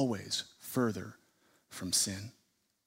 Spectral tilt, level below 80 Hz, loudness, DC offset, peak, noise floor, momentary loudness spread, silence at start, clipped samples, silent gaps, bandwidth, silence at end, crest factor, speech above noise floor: -3 dB/octave; -72 dBFS; -34 LUFS; under 0.1%; -16 dBFS; -70 dBFS; 20 LU; 0 s; under 0.1%; none; 16 kHz; 0.55 s; 20 dB; 35 dB